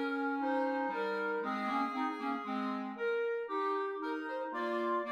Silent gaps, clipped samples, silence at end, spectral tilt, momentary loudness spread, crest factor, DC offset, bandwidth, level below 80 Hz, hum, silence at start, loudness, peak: none; under 0.1%; 0 s; -6 dB/octave; 4 LU; 12 dB; under 0.1%; 10.5 kHz; -86 dBFS; none; 0 s; -36 LUFS; -22 dBFS